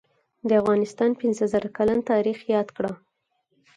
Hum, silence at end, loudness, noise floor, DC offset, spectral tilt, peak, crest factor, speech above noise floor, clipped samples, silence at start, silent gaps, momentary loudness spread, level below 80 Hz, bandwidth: none; 0.8 s; -24 LUFS; -73 dBFS; under 0.1%; -6.5 dB/octave; -8 dBFS; 16 dB; 51 dB; under 0.1%; 0.45 s; none; 10 LU; -60 dBFS; 9.8 kHz